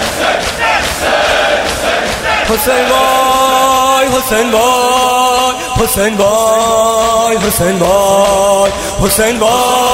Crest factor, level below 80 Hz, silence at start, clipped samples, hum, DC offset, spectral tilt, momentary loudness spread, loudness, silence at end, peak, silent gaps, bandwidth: 10 dB; -30 dBFS; 0 s; under 0.1%; none; under 0.1%; -2.5 dB/octave; 4 LU; -10 LUFS; 0 s; 0 dBFS; none; 16.5 kHz